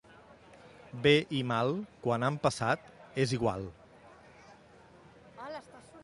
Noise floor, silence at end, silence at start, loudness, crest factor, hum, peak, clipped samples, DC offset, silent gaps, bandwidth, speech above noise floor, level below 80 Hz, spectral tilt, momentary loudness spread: -57 dBFS; 0 s; 0.3 s; -31 LUFS; 22 dB; none; -12 dBFS; under 0.1%; under 0.1%; none; 11.5 kHz; 27 dB; -62 dBFS; -5.5 dB/octave; 19 LU